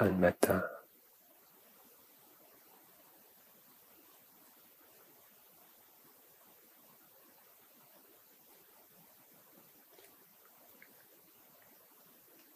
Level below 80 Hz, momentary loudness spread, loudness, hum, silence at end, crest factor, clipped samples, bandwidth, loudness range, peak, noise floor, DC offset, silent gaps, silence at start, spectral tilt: -74 dBFS; 16 LU; -33 LUFS; none; 11.75 s; 30 dB; under 0.1%; 15.5 kHz; 16 LU; -12 dBFS; -64 dBFS; under 0.1%; none; 0 s; -6 dB/octave